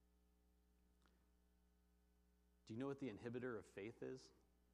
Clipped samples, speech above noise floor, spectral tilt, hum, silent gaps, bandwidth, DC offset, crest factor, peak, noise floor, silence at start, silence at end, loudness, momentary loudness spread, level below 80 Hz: under 0.1%; 27 dB; -7 dB/octave; 60 Hz at -75 dBFS; none; 11.5 kHz; under 0.1%; 18 dB; -38 dBFS; -79 dBFS; 2.65 s; 0.35 s; -53 LUFS; 8 LU; -80 dBFS